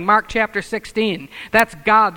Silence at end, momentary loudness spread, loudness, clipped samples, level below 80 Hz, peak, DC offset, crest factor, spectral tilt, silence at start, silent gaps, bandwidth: 0 s; 9 LU; -18 LUFS; under 0.1%; -44 dBFS; 0 dBFS; under 0.1%; 18 dB; -4.5 dB/octave; 0 s; none; over 20 kHz